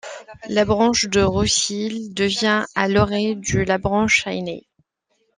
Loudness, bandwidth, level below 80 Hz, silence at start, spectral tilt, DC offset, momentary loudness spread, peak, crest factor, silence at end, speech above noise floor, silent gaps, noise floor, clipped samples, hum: -19 LUFS; 10.5 kHz; -42 dBFS; 0.05 s; -3.5 dB/octave; under 0.1%; 10 LU; -2 dBFS; 18 dB; 0.8 s; 49 dB; none; -69 dBFS; under 0.1%; none